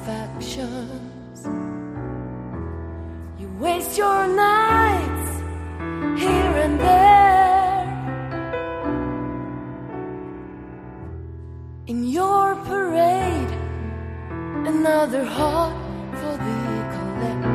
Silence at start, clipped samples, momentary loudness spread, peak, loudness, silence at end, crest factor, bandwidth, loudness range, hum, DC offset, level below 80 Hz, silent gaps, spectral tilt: 0 s; under 0.1%; 19 LU; -4 dBFS; -21 LUFS; 0 s; 18 dB; 14 kHz; 13 LU; none; under 0.1%; -38 dBFS; none; -6 dB/octave